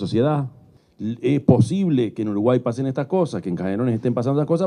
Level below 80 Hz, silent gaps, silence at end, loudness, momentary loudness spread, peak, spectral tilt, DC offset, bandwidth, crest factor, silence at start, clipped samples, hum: -58 dBFS; none; 0 s; -21 LUFS; 8 LU; 0 dBFS; -8.5 dB/octave; under 0.1%; 10.5 kHz; 20 dB; 0 s; under 0.1%; none